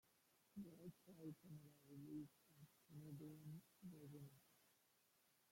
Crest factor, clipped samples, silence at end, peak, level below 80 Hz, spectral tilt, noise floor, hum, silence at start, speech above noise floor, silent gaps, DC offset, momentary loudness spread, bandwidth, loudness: 16 dB; under 0.1%; 0 s; -46 dBFS; -90 dBFS; -7 dB/octave; -81 dBFS; none; 0.05 s; 22 dB; none; under 0.1%; 7 LU; 16.5 kHz; -61 LUFS